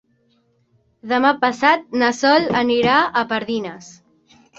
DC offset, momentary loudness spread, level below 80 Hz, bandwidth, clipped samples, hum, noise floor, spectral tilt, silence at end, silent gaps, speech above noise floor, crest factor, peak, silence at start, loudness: under 0.1%; 8 LU; -58 dBFS; 8 kHz; under 0.1%; none; -62 dBFS; -4 dB/octave; 0.65 s; none; 44 dB; 18 dB; -2 dBFS; 1.05 s; -17 LUFS